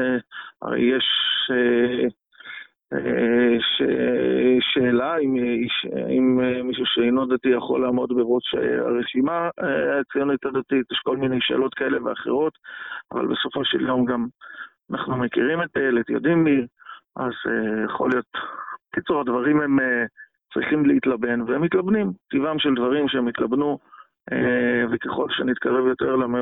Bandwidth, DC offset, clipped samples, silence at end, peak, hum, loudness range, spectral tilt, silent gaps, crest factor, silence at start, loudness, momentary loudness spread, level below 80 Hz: 4 kHz; under 0.1%; under 0.1%; 0 s; -8 dBFS; none; 3 LU; -9 dB/octave; none; 14 dB; 0 s; -22 LUFS; 11 LU; -60 dBFS